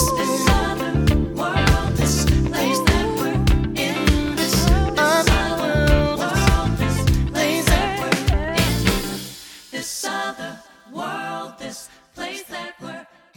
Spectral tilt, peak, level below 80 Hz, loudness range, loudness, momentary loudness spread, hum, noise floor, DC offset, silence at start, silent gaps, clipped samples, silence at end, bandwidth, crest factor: -4.5 dB/octave; 0 dBFS; -26 dBFS; 11 LU; -20 LUFS; 15 LU; none; -40 dBFS; under 0.1%; 0 s; none; under 0.1%; 0.35 s; 19 kHz; 20 dB